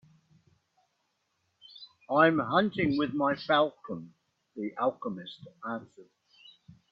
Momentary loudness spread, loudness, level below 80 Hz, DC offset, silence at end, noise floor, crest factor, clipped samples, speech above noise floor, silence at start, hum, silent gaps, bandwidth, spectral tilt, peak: 22 LU; -29 LUFS; -68 dBFS; under 0.1%; 0.9 s; -78 dBFS; 24 dB; under 0.1%; 49 dB; 1.8 s; none; none; 6.2 kHz; -8 dB/octave; -8 dBFS